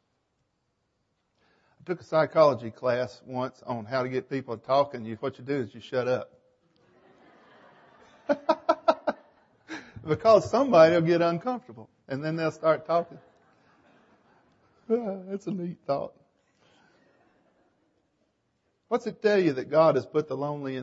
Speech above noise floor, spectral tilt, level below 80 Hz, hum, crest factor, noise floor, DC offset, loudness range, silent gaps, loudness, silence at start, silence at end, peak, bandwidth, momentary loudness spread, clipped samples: 50 dB; -7 dB/octave; -70 dBFS; none; 22 dB; -76 dBFS; under 0.1%; 11 LU; none; -26 LUFS; 1.9 s; 0 s; -6 dBFS; 7.8 kHz; 15 LU; under 0.1%